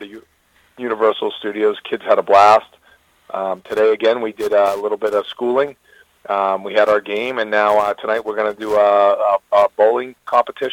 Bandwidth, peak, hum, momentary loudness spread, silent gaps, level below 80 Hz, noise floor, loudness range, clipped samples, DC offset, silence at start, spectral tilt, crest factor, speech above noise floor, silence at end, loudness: 16.5 kHz; -2 dBFS; none; 10 LU; none; -60 dBFS; -57 dBFS; 3 LU; under 0.1%; under 0.1%; 0 s; -4.5 dB/octave; 16 dB; 41 dB; 0 s; -17 LUFS